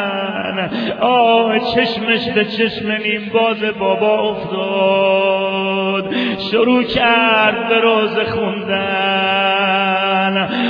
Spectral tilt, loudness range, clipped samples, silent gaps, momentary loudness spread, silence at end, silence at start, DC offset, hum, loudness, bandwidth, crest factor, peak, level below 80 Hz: -7 dB/octave; 2 LU; under 0.1%; none; 7 LU; 0 s; 0 s; under 0.1%; none; -15 LUFS; 5.4 kHz; 14 dB; -2 dBFS; -50 dBFS